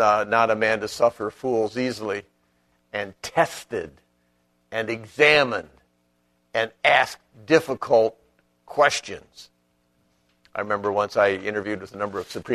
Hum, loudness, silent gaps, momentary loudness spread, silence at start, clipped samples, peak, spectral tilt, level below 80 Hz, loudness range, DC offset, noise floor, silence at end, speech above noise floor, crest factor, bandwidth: 60 Hz at -65 dBFS; -23 LUFS; none; 14 LU; 0 s; under 0.1%; -2 dBFS; -4 dB/octave; -62 dBFS; 6 LU; under 0.1%; -68 dBFS; 0 s; 45 dB; 24 dB; 13.5 kHz